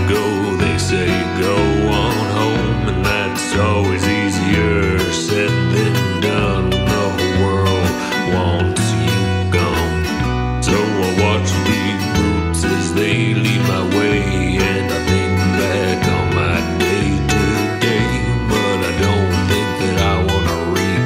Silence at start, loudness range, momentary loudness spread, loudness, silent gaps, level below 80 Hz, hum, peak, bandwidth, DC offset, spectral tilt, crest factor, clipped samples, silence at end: 0 s; 1 LU; 2 LU; -16 LUFS; none; -30 dBFS; none; -2 dBFS; 16 kHz; under 0.1%; -5.5 dB/octave; 14 dB; under 0.1%; 0 s